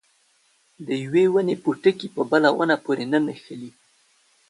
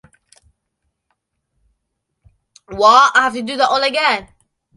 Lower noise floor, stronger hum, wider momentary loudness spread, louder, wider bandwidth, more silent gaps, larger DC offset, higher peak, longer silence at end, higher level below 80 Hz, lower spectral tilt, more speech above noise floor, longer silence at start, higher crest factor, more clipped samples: second, -63 dBFS vs -74 dBFS; neither; first, 19 LU vs 11 LU; second, -22 LUFS vs -13 LUFS; about the same, 11.5 kHz vs 11.5 kHz; neither; neither; second, -4 dBFS vs 0 dBFS; first, 0.8 s vs 0.5 s; second, -70 dBFS vs -54 dBFS; first, -6.5 dB/octave vs -2 dB/octave; second, 42 dB vs 60 dB; second, 0.8 s vs 2.7 s; about the same, 18 dB vs 18 dB; neither